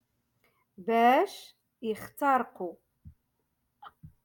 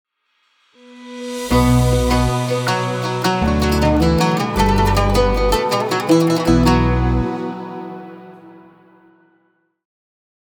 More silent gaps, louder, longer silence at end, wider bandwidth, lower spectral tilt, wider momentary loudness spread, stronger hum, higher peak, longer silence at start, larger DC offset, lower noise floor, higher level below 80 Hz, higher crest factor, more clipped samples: neither; second, -28 LUFS vs -16 LUFS; second, 0.15 s vs 1.95 s; second, 17.5 kHz vs over 20 kHz; about the same, -5 dB/octave vs -6 dB/octave; first, 18 LU vs 15 LU; neither; second, -12 dBFS vs -2 dBFS; about the same, 0.8 s vs 0.9 s; neither; first, -78 dBFS vs -64 dBFS; second, -68 dBFS vs -26 dBFS; about the same, 18 dB vs 16 dB; neither